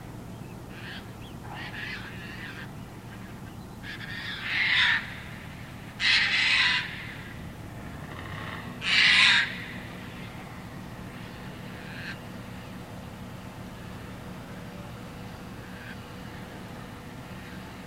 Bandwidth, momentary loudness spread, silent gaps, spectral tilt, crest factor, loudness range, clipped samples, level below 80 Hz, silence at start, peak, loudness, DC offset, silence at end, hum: 16 kHz; 21 LU; none; -2.5 dB/octave; 26 dB; 17 LU; under 0.1%; -52 dBFS; 0 s; -6 dBFS; -24 LUFS; under 0.1%; 0 s; none